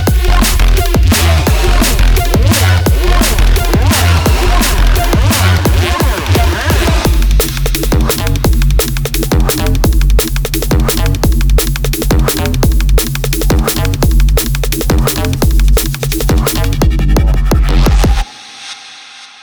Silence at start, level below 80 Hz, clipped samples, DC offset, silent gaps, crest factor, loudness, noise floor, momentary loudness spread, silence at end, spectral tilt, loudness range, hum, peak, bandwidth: 0 s; -12 dBFS; under 0.1%; under 0.1%; none; 10 dB; -12 LUFS; -33 dBFS; 5 LU; 0.15 s; -4.5 dB/octave; 2 LU; none; 0 dBFS; over 20 kHz